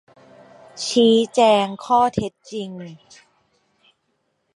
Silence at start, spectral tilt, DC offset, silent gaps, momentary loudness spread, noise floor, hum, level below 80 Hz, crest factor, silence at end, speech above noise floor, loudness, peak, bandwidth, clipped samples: 0.75 s; -4.5 dB/octave; under 0.1%; none; 17 LU; -70 dBFS; none; -58 dBFS; 20 dB; 1.6 s; 52 dB; -18 LUFS; -2 dBFS; 11.5 kHz; under 0.1%